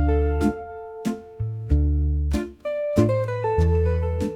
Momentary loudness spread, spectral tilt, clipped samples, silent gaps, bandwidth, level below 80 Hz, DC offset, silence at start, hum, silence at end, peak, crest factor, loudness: 10 LU; -8.5 dB/octave; under 0.1%; none; 11.5 kHz; -28 dBFS; under 0.1%; 0 s; none; 0 s; -6 dBFS; 16 dB; -24 LUFS